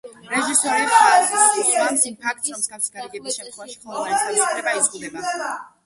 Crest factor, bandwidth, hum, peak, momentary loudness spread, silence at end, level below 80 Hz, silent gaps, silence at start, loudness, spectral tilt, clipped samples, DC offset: 20 dB; 12 kHz; none; -2 dBFS; 15 LU; 0.2 s; -68 dBFS; none; 0.05 s; -19 LUFS; 0 dB/octave; under 0.1%; under 0.1%